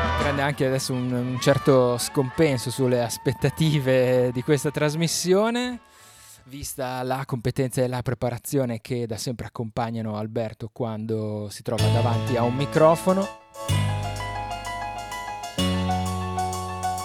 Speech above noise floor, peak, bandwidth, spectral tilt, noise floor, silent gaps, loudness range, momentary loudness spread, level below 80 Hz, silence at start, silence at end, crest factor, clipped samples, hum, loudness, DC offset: 26 dB; -6 dBFS; 17.5 kHz; -5.5 dB/octave; -49 dBFS; none; 6 LU; 11 LU; -46 dBFS; 0 s; 0 s; 18 dB; under 0.1%; none; -24 LUFS; under 0.1%